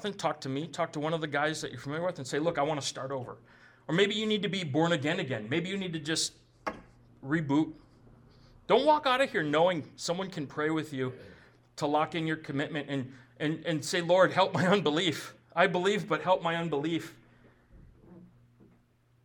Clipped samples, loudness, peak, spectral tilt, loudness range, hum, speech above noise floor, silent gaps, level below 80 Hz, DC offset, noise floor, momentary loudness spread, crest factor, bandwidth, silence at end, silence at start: under 0.1%; -30 LUFS; -10 dBFS; -4.5 dB/octave; 6 LU; none; 36 dB; none; -68 dBFS; under 0.1%; -66 dBFS; 12 LU; 20 dB; 19 kHz; 1 s; 0 s